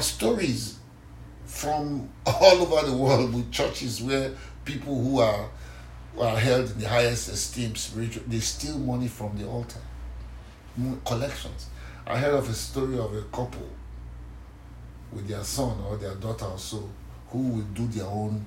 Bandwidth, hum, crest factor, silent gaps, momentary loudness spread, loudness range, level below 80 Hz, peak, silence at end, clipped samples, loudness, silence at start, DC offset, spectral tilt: 16 kHz; none; 26 dB; none; 20 LU; 11 LU; -42 dBFS; -2 dBFS; 0 s; under 0.1%; -27 LUFS; 0 s; under 0.1%; -5 dB/octave